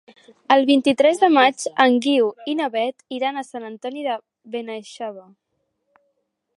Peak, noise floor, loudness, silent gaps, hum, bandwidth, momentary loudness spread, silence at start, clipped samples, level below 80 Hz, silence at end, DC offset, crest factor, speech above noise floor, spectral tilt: 0 dBFS; -73 dBFS; -19 LUFS; none; none; 11.5 kHz; 17 LU; 0.5 s; under 0.1%; -74 dBFS; 1.35 s; under 0.1%; 20 dB; 54 dB; -3 dB/octave